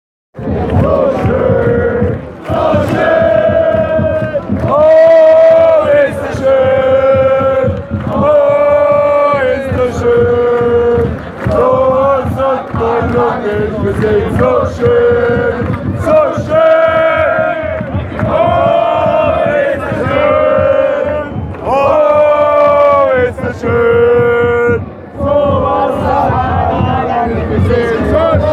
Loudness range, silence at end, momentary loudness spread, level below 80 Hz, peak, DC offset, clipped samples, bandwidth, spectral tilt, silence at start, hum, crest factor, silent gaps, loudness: 4 LU; 0 s; 8 LU; -30 dBFS; 0 dBFS; under 0.1%; under 0.1%; 11 kHz; -8 dB/octave; 0.35 s; none; 10 dB; none; -11 LUFS